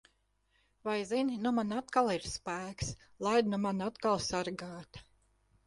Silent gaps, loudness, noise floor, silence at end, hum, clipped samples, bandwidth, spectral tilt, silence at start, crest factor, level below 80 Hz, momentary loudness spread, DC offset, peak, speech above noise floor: none; -34 LUFS; -75 dBFS; 0.65 s; 50 Hz at -55 dBFS; under 0.1%; 11.5 kHz; -4.5 dB/octave; 0.85 s; 20 dB; -60 dBFS; 12 LU; under 0.1%; -14 dBFS; 41 dB